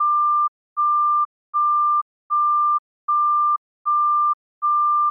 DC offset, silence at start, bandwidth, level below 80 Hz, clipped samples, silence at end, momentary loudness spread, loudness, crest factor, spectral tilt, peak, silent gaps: under 0.1%; 0 s; 1.4 kHz; under -90 dBFS; under 0.1%; 0 s; 7 LU; -20 LUFS; 6 dB; 0.5 dB/octave; -14 dBFS; 0.48-0.76 s, 1.25-1.53 s, 2.02-2.30 s, 2.79-3.08 s, 3.58-3.85 s, 4.34-4.61 s